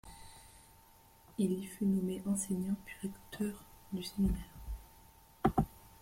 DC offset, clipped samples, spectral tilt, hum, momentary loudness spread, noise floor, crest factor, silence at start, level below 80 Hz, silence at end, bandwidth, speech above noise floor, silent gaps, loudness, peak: under 0.1%; under 0.1%; -6 dB/octave; none; 19 LU; -62 dBFS; 24 dB; 0.05 s; -50 dBFS; 0.15 s; 16.5 kHz; 26 dB; none; -37 LUFS; -14 dBFS